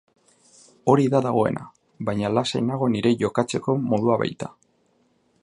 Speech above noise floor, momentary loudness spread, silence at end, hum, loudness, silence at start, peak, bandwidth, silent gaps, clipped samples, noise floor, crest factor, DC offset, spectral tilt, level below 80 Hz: 43 dB; 10 LU; 0.9 s; none; -23 LUFS; 0.85 s; -4 dBFS; 11 kHz; none; under 0.1%; -65 dBFS; 20 dB; under 0.1%; -6.5 dB/octave; -60 dBFS